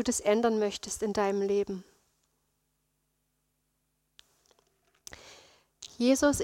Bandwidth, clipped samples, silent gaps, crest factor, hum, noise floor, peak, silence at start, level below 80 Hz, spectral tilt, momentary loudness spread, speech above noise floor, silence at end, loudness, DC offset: 16.5 kHz; under 0.1%; none; 20 dB; none; -78 dBFS; -14 dBFS; 0 s; -60 dBFS; -4 dB/octave; 23 LU; 50 dB; 0 s; -29 LUFS; under 0.1%